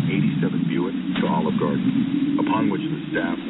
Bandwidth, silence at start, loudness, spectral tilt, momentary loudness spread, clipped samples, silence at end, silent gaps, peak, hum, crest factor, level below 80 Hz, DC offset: 4.1 kHz; 0 s; -22 LUFS; -6 dB/octave; 4 LU; under 0.1%; 0 s; none; -10 dBFS; none; 12 dB; -56 dBFS; under 0.1%